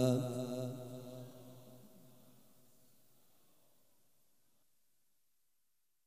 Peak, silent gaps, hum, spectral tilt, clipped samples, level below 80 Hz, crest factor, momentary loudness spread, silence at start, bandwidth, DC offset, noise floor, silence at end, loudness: -20 dBFS; none; none; -7 dB/octave; under 0.1%; -84 dBFS; 26 dB; 25 LU; 0 s; 15.5 kHz; under 0.1%; -85 dBFS; 3.95 s; -42 LUFS